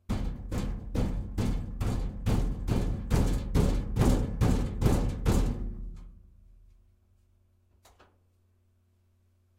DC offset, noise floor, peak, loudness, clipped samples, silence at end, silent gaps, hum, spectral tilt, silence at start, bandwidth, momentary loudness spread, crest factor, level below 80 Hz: under 0.1%; -68 dBFS; -10 dBFS; -31 LUFS; under 0.1%; 3.45 s; none; none; -7 dB/octave; 0.1 s; 16 kHz; 8 LU; 20 dB; -34 dBFS